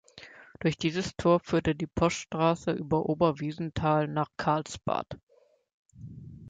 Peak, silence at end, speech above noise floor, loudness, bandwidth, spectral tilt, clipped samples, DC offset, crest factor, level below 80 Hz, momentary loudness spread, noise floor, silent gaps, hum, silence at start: -10 dBFS; 0 s; 23 dB; -29 LUFS; 9.2 kHz; -6 dB/octave; under 0.1%; under 0.1%; 18 dB; -52 dBFS; 21 LU; -51 dBFS; 5.23-5.27 s, 5.73-5.85 s; none; 0.15 s